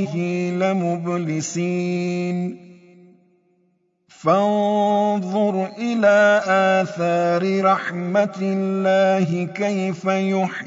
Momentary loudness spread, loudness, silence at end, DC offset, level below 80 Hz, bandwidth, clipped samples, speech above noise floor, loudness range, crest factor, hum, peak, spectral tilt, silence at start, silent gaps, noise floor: 7 LU; -20 LUFS; 0 s; under 0.1%; -72 dBFS; 7.8 kHz; under 0.1%; 46 dB; 7 LU; 14 dB; none; -6 dBFS; -6 dB/octave; 0 s; none; -65 dBFS